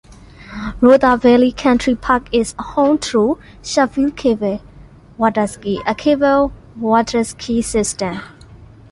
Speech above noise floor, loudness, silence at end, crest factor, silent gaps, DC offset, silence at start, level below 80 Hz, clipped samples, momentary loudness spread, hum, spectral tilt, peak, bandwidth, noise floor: 26 dB; -16 LUFS; 0.25 s; 16 dB; none; under 0.1%; 0.1 s; -40 dBFS; under 0.1%; 12 LU; none; -4.5 dB/octave; -2 dBFS; 11.5 kHz; -41 dBFS